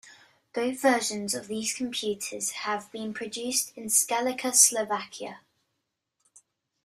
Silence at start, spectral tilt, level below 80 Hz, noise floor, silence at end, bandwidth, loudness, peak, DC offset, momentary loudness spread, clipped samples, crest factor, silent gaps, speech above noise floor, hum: 0.05 s; -1 dB/octave; -74 dBFS; -81 dBFS; 1.45 s; 15.5 kHz; -26 LUFS; -4 dBFS; under 0.1%; 16 LU; under 0.1%; 26 dB; none; 53 dB; none